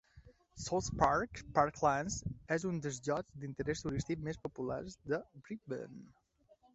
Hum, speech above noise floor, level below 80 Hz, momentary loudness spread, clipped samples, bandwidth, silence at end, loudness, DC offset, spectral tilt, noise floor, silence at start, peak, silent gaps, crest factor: none; 32 dB; -56 dBFS; 13 LU; under 0.1%; 8 kHz; 0.65 s; -37 LUFS; under 0.1%; -5.5 dB/octave; -69 dBFS; 0.15 s; -14 dBFS; none; 24 dB